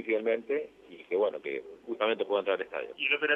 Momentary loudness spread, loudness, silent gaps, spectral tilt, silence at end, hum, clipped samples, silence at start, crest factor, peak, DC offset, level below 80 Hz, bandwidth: 11 LU; -31 LUFS; none; -5 dB/octave; 0 s; none; under 0.1%; 0 s; 18 dB; -12 dBFS; under 0.1%; -78 dBFS; 4.1 kHz